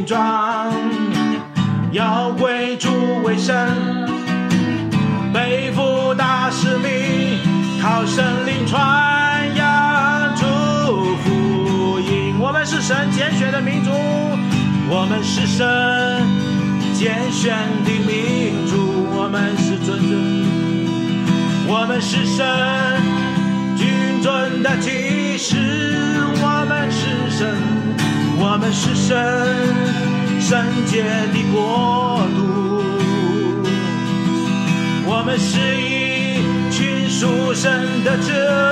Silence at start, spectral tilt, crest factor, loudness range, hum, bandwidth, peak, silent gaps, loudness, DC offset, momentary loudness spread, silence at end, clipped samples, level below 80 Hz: 0 s; -5.5 dB/octave; 14 dB; 2 LU; none; 12 kHz; -2 dBFS; none; -17 LUFS; under 0.1%; 3 LU; 0 s; under 0.1%; -54 dBFS